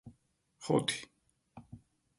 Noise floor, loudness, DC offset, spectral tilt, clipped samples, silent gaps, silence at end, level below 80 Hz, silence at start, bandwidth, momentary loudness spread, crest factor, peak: -73 dBFS; -34 LUFS; under 0.1%; -4.5 dB/octave; under 0.1%; none; 0.4 s; -70 dBFS; 0.05 s; 11.5 kHz; 25 LU; 22 dB; -16 dBFS